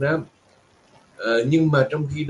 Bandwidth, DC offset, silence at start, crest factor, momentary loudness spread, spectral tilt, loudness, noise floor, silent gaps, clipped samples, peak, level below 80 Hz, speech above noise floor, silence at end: 9.6 kHz; under 0.1%; 0 s; 18 dB; 11 LU; -7.5 dB/octave; -21 LUFS; -57 dBFS; none; under 0.1%; -6 dBFS; -56 dBFS; 37 dB; 0 s